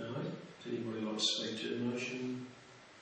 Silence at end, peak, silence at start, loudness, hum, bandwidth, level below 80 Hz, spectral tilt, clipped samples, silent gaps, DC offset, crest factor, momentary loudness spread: 0 s; -20 dBFS; 0 s; -38 LUFS; none; 8.4 kHz; -82 dBFS; -3.5 dB/octave; under 0.1%; none; under 0.1%; 20 dB; 16 LU